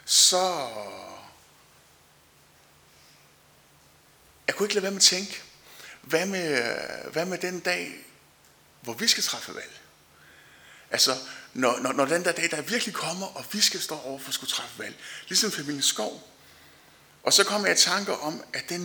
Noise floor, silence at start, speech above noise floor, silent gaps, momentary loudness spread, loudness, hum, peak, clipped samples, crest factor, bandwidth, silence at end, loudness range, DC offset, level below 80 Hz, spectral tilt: -58 dBFS; 0.05 s; 31 dB; none; 19 LU; -25 LUFS; none; -4 dBFS; under 0.1%; 24 dB; over 20 kHz; 0 s; 5 LU; under 0.1%; -72 dBFS; -1 dB/octave